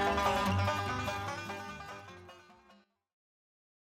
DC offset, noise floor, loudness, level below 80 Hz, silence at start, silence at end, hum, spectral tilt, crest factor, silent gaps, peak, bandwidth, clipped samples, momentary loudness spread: under 0.1%; -65 dBFS; -34 LUFS; -56 dBFS; 0 s; 1.45 s; none; -5 dB/octave; 18 dB; none; -18 dBFS; 16 kHz; under 0.1%; 21 LU